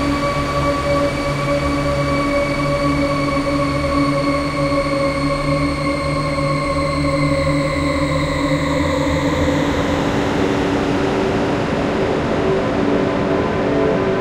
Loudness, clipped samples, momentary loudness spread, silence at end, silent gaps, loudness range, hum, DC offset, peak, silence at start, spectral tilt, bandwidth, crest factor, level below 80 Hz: -18 LUFS; under 0.1%; 2 LU; 0 s; none; 1 LU; none; under 0.1%; -4 dBFS; 0 s; -6 dB/octave; 15 kHz; 12 dB; -30 dBFS